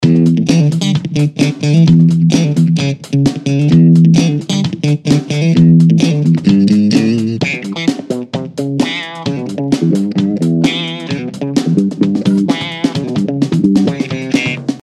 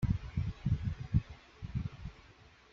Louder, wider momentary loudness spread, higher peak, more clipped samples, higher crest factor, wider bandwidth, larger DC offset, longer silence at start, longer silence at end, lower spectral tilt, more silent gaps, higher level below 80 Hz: first, -12 LUFS vs -37 LUFS; second, 11 LU vs 15 LU; first, 0 dBFS vs -16 dBFS; neither; second, 12 dB vs 20 dB; first, 11 kHz vs 7 kHz; neither; about the same, 0 s vs 0 s; second, 0 s vs 0.25 s; second, -7 dB/octave vs -8.5 dB/octave; neither; about the same, -48 dBFS vs -44 dBFS